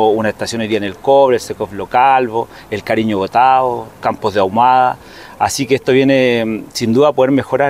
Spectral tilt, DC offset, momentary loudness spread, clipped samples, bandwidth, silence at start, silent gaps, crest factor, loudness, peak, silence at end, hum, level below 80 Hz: -5 dB/octave; 0.1%; 9 LU; under 0.1%; 16 kHz; 0 s; none; 14 dB; -14 LUFS; 0 dBFS; 0 s; none; -50 dBFS